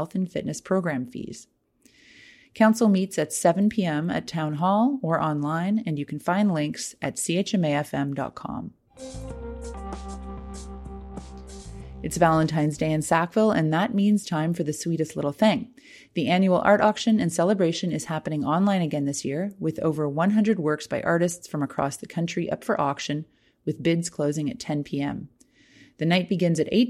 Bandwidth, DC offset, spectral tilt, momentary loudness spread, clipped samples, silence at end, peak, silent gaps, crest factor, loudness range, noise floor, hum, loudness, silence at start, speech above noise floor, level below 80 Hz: 15 kHz; under 0.1%; -5.5 dB/octave; 16 LU; under 0.1%; 0 s; -6 dBFS; none; 20 dB; 6 LU; -60 dBFS; none; -24 LUFS; 0 s; 36 dB; -48 dBFS